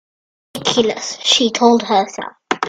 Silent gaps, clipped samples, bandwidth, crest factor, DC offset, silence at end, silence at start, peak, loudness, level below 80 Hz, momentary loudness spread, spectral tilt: none; under 0.1%; 14.5 kHz; 18 dB; under 0.1%; 0 s; 0.55 s; 0 dBFS; -15 LUFS; -60 dBFS; 12 LU; -2.5 dB/octave